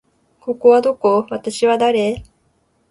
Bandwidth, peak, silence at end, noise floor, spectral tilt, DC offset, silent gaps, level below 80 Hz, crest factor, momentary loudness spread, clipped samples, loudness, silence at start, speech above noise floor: 11.5 kHz; -2 dBFS; 0.7 s; -62 dBFS; -5 dB/octave; under 0.1%; none; -50 dBFS; 16 dB; 14 LU; under 0.1%; -16 LUFS; 0.45 s; 46 dB